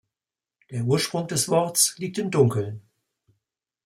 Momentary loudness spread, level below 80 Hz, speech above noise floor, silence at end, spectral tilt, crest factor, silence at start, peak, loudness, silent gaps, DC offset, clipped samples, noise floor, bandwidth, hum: 13 LU; -64 dBFS; over 67 dB; 1.05 s; -4 dB/octave; 20 dB; 0.7 s; -6 dBFS; -23 LUFS; none; under 0.1%; under 0.1%; under -90 dBFS; 16.5 kHz; none